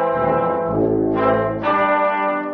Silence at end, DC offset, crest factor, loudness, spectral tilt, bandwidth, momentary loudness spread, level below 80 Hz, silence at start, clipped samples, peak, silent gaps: 0 s; under 0.1%; 16 dB; -18 LUFS; -5.5 dB/octave; 5.4 kHz; 2 LU; -44 dBFS; 0 s; under 0.1%; -2 dBFS; none